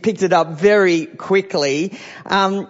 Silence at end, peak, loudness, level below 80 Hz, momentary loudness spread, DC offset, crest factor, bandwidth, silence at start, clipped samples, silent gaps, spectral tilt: 0.05 s; -2 dBFS; -17 LUFS; -62 dBFS; 8 LU; under 0.1%; 14 dB; 8 kHz; 0 s; under 0.1%; none; -5 dB/octave